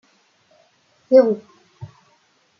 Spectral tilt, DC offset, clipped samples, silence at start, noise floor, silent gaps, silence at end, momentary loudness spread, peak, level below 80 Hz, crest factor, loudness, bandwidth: -8 dB/octave; under 0.1%; under 0.1%; 1.1 s; -61 dBFS; none; 0.75 s; 27 LU; -2 dBFS; -72 dBFS; 20 dB; -17 LUFS; 6 kHz